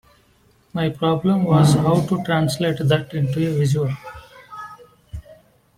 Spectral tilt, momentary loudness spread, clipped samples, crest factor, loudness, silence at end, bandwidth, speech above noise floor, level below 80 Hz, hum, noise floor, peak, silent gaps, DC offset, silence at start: -7 dB/octave; 23 LU; under 0.1%; 16 dB; -19 LUFS; 0.45 s; 15 kHz; 39 dB; -48 dBFS; none; -57 dBFS; -4 dBFS; none; under 0.1%; 0.75 s